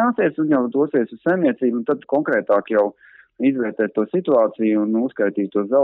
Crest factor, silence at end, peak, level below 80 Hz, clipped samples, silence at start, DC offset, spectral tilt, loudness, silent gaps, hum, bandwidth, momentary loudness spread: 12 dB; 0 s; -6 dBFS; -72 dBFS; under 0.1%; 0 s; under 0.1%; -10 dB/octave; -20 LUFS; none; none; 4 kHz; 4 LU